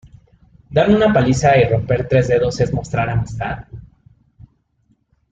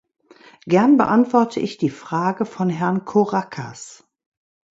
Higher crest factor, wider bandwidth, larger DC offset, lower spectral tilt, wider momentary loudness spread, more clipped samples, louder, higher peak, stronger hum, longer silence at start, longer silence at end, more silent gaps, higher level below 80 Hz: about the same, 16 dB vs 18 dB; about the same, 8.8 kHz vs 8 kHz; neither; about the same, -6.5 dB/octave vs -7 dB/octave; second, 11 LU vs 17 LU; neither; first, -16 LUFS vs -19 LUFS; about the same, -2 dBFS vs -2 dBFS; neither; about the same, 0.7 s vs 0.65 s; first, 1.45 s vs 0.85 s; neither; first, -38 dBFS vs -62 dBFS